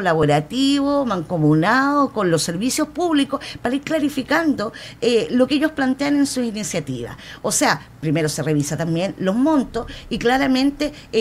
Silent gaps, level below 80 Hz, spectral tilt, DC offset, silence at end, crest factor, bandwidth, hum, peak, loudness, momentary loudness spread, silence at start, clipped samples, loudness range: none; -46 dBFS; -4.5 dB/octave; under 0.1%; 0 s; 16 dB; 15.5 kHz; none; -2 dBFS; -20 LUFS; 8 LU; 0 s; under 0.1%; 2 LU